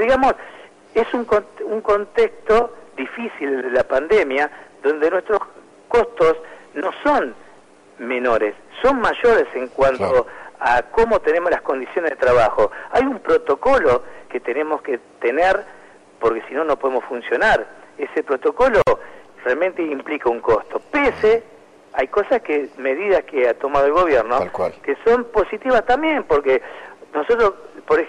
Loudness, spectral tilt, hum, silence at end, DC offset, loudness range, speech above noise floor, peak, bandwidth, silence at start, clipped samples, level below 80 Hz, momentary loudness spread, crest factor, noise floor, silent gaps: -19 LUFS; -5.5 dB/octave; none; 0 s; under 0.1%; 3 LU; 30 dB; -8 dBFS; 10.5 kHz; 0 s; under 0.1%; -44 dBFS; 10 LU; 12 dB; -48 dBFS; none